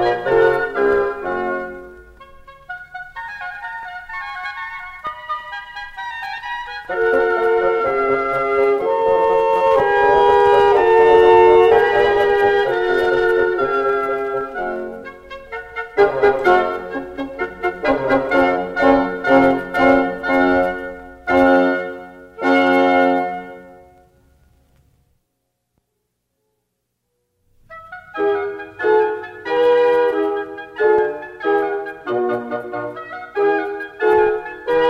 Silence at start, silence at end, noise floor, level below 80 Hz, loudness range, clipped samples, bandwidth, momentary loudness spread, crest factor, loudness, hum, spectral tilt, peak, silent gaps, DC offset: 0 s; 0 s; -74 dBFS; -46 dBFS; 15 LU; under 0.1%; 8.2 kHz; 17 LU; 16 dB; -17 LUFS; none; -6 dB/octave; 0 dBFS; none; under 0.1%